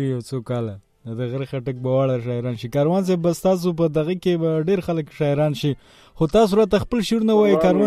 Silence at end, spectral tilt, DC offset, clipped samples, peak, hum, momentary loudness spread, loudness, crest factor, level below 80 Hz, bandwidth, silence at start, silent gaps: 0 s; -7 dB/octave; under 0.1%; under 0.1%; -4 dBFS; none; 11 LU; -21 LUFS; 16 dB; -46 dBFS; 15 kHz; 0 s; none